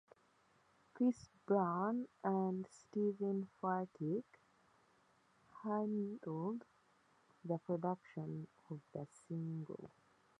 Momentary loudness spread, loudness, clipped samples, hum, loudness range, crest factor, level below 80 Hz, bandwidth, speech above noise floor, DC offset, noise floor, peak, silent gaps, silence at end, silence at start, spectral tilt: 13 LU; -42 LUFS; under 0.1%; none; 6 LU; 20 dB; -84 dBFS; 10 kHz; 33 dB; under 0.1%; -74 dBFS; -24 dBFS; none; 0.5 s; 0.95 s; -9 dB/octave